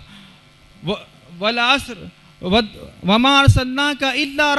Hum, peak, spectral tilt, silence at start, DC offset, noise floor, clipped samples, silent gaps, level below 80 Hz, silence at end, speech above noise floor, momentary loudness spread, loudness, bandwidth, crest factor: none; 0 dBFS; -5 dB/octave; 0.8 s; under 0.1%; -48 dBFS; under 0.1%; none; -34 dBFS; 0 s; 31 dB; 18 LU; -17 LUFS; 12 kHz; 18 dB